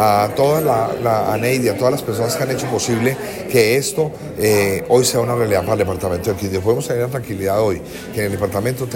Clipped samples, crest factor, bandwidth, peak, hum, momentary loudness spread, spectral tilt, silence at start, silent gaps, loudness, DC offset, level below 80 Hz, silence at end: under 0.1%; 16 dB; 16.5 kHz; -2 dBFS; none; 7 LU; -5 dB/octave; 0 s; none; -18 LUFS; under 0.1%; -48 dBFS; 0 s